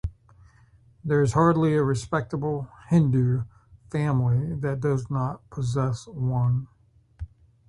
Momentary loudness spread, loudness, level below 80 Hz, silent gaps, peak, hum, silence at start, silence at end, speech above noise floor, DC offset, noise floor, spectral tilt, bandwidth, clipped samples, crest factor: 17 LU; -25 LUFS; -46 dBFS; none; -6 dBFS; none; 0.05 s; 0.4 s; 33 dB; under 0.1%; -56 dBFS; -8 dB/octave; 11 kHz; under 0.1%; 18 dB